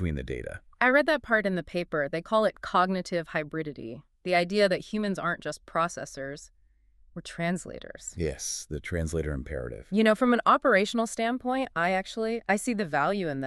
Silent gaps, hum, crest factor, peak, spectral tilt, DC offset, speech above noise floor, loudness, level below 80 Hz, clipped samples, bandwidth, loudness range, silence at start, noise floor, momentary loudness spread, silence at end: none; none; 20 dB; -8 dBFS; -5 dB/octave; under 0.1%; 33 dB; -27 LUFS; -48 dBFS; under 0.1%; 13.5 kHz; 8 LU; 0 s; -61 dBFS; 15 LU; 0 s